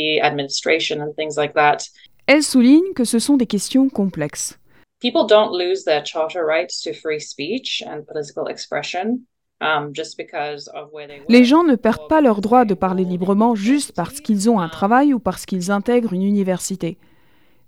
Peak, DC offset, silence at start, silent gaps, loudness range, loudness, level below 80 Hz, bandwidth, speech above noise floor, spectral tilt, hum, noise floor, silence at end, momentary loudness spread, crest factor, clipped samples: 0 dBFS; under 0.1%; 0 s; none; 8 LU; -18 LUFS; -56 dBFS; 15.5 kHz; 40 dB; -4.5 dB/octave; none; -58 dBFS; 0.75 s; 13 LU; 18 dB; under 0.1%